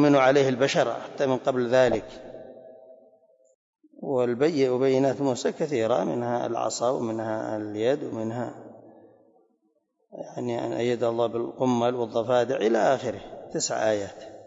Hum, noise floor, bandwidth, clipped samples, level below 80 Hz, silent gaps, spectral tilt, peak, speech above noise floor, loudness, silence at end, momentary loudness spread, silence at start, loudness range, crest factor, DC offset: none; -71 dBFS; 8 kHz; under 0.1%; -64 dBFS; 3.55-3.73 s; -5 dB/octave; -10 dBFS; 47 dB; -25 LUFS; 0 s; 14 LU; 0 s; 7 LU; 16 dB; under 0.1%